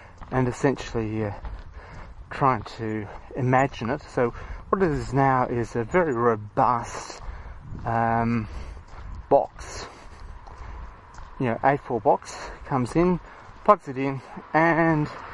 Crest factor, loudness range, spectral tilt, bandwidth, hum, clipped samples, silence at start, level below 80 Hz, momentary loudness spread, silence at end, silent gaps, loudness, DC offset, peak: 24 dB; 4 LU; -7 dB/octave; 11.5 kHz; none; under 0.1%; 0 s; -42 dBFS; 21 LU; 0 s; none; -24 LUFS; under 0.1%; -2 dBFS